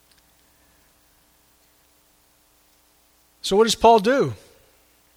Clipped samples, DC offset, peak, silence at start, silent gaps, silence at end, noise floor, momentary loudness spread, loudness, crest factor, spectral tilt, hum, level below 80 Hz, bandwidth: under 0.1%; under 0.1%; -2 dBFS; 3.45 s; none; 0.8 s; -60 dBFS; 15 LU; -18 LUFS; 22 dB; -4 dB/octave; none; -54 dBFS; 16 kHz